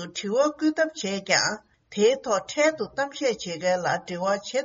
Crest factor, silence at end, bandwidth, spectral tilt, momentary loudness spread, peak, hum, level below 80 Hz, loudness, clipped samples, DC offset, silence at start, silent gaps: 18 dB; 0 s; 7.6 kHz; -2.5 dB/octave; 7 LU; -6 dBFS; none; -66 dBFS; -25 LUFS; under 0.1%; under 0.1%; 0 s; none